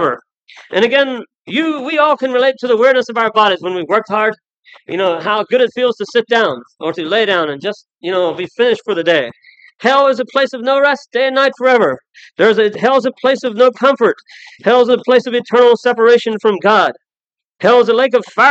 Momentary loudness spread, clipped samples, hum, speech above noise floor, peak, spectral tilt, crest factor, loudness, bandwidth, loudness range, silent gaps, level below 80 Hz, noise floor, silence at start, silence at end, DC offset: 9 LU; under 0.1%; none; 73 dB; 0 dBFS; -4.5 dB/octave; 14 dB; -13 LUFS; 8 kHz; 4 LU; 4.57-4.63 s; -72 dBFS; -86 dBFS; 0 s; 0 s; under 0.1%